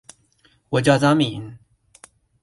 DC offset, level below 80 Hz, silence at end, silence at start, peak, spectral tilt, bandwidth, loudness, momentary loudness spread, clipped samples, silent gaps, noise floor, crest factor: under 0.1%; -56 dBFS; 0.85 s; 0.7 s; -2 dBFS; -6 dB/octave; 11.5 kHz; -19 LUFS; 19 LU; under 0.1%; none; -60 dBFS; 20 dB